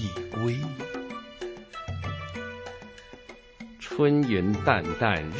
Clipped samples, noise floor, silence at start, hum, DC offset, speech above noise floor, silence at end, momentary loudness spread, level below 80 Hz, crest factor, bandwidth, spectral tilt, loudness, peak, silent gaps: under 0.1%; -48 dBFS; 0 s; none; under 0.1%; 23 dB; 0 s; 22 LU; -48 dBFS; 24 dB; 8 kHz; -7 dB/octave; -28 LUFS; -6 dBFS; none